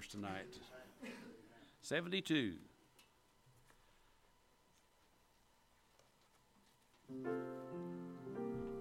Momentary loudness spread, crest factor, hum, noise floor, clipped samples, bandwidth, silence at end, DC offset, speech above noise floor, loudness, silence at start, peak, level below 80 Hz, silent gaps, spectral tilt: 19 LU; 24 dB; none; -73 dBFS; under 0.1%; 16.5 kHz; 0 s; under 0.1%; 30 dB; -45 LUFS; 0 s; -24 dBFS; -74 dBFS; none; -5 dB/octave